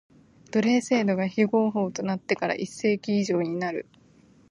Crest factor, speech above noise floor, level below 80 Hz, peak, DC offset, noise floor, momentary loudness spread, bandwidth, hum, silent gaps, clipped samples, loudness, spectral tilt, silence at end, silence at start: 18 dB; 32 dB; -68 dBFS; -8 dBFS; under 0.1%; -57 dBFS; 7 LU; 11 kHz; none; none; under 0.1%; -26 LUFS; -6 dB/octave; 0.7 s; 0.55 s